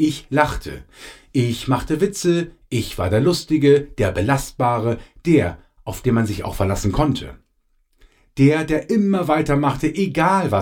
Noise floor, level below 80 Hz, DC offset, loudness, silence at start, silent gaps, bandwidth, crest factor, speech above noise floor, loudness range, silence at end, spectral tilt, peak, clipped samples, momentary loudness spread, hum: -63 dBFS; -38 dBFS; under 0.1%; -19 LUFS; 0 s; none; 17.5 kHz; 20 dB; 45 dB; 3 LU; 0 s; -6.5 dB/octave; 0 dBFS; under 0.1%; 11 LU; none